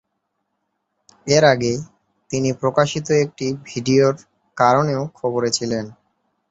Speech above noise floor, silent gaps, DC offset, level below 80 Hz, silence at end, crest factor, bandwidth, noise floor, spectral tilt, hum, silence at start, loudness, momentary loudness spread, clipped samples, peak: 56 dB; none; under 0.1%; -58 dBFS; 0.6 s; 18 dB; 8.2 kHz; -74 dBFS; -5 dB/octave; none; 1.25 s; -19 LUFS; 12 LU; under 0.1%; -2 dBFS